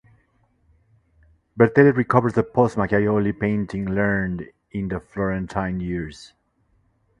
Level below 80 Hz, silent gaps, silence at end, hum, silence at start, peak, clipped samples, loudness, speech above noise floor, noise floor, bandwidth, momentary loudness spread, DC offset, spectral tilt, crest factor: -46 dBFS; none; 0.95 s; none; 1.55 s; 0 dBFS; under 0.1%; -21 LUFS; 44 dB; -65 dBFS; 10.5 kHz; 13 LU; under 0.1%; -8.5 dB/octave; 22 dB